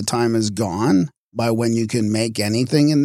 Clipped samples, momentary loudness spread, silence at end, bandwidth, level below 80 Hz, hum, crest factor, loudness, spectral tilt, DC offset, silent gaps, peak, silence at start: under 0.1%; 5 LU; 0 s; 15.5 kHz; -56 dBFS; none; 14 dB; -19 LUFS; -5.5 dB/octave; under 0.1%; 1.17-1.32 s; -4 dBFS; 0 s